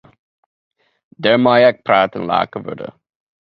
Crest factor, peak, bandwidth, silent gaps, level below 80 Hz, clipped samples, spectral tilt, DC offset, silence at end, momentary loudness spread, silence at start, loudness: 18 dB; 0 dBFS; 5.6 kHz; none; -58 dBFS; under 0.1%; -8 dB/octave; under 0.1%; 0.7 s; 18 LU; 1.2 s; -15 LUFS